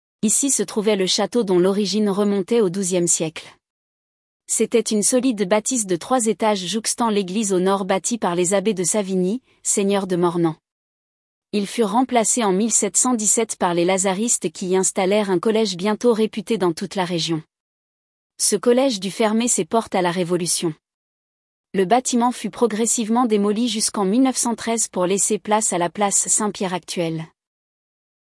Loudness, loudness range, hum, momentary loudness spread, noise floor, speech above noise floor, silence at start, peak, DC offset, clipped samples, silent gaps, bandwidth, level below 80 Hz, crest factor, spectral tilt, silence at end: -19 LUFS; 3 LU; none; 6 LU; under -90 dBFS; over 70 dB; 0.25 s; -4 dBFS; under 0.1%; under 0.1%; 3.70-4.40 s, 10.72-11.42 s, 17.60-18.30 s, 20.94-21.64 s; 12 kHz; -66 dBFS; 16 dB; -3.5 dB/octave; 0.95 s